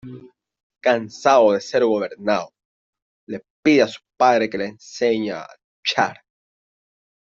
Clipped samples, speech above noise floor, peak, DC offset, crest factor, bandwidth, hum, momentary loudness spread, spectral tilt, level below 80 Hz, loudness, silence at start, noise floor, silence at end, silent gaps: under 0.1%; 24 dB; -2 dBFS; under 0.1%; 18 dB; 7.8 kHz; none; 17 LU; -4.5 dB/octave; -66 dBFS; -20 LUFS; 0.05 s; -43 dBFS; 1.15 s; 0.63-0.70 s, 2.65-2.93 s, 3.02-3.27 s, 3.50-3.63 s, 5.64-5.83 s